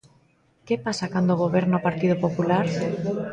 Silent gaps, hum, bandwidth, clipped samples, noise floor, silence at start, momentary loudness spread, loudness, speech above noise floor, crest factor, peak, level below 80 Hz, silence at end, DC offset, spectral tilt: none; none; 9.2 kHz; under 0.1%; -61 dBFS; 0.65 s; 5 LU; -24 LUFS; 38 dB; 16 dB; -8 dBFS; -58 dBFS; 0 s; under 0.1%; -7 dB/octave